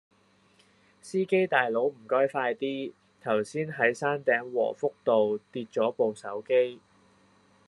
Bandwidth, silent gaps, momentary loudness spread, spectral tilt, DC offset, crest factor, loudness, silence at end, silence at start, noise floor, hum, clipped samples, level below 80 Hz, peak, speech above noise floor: 11.5 kHz; none; 9 LU; -5.5 dB/octave; under 0.1%; 22 dB; -28 LUFS; 0.9 s; 1.05 s; -63 dBFS; none; under 0.1%; -82 dBFS; -8 dBFS; 36 dB